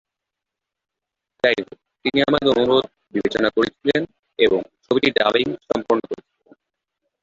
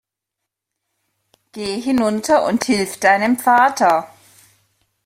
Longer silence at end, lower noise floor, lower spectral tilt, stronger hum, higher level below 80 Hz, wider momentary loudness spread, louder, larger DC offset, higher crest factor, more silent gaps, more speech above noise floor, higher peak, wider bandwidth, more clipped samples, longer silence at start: about the same, 1.1 s vs 1 s; about the same, -84 dBFS vs -81 dBFS; first, -5.5 dB/octave vs -4 dB/octave; neither; about the same, -56 dBFS vs -58 dBFS; about the same, 9 LU vs 9 LU; second, -20 LUFS vs -16 LUFS; neither; about the same, 20 dB vs 18 dB; first, 4.19-4.23 s vs none; about the same, 65 dB vs 65 dB; about the same, -2 dBFS vs -2 dBFS; second, 7.6 kHz vs 16.5 kHz; neither; about the same, 1.45 s vs 1.55 s